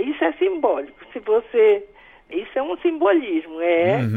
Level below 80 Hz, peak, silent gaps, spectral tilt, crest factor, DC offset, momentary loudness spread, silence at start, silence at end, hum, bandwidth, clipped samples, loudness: -60 dBFS; -6 dBFS; none; -8.5 dB/octave; 14 dB; under 0.1%; 12 LU; 0 s; 0 s; none; 4.4 kHz; under 0.1%; -20 LUFS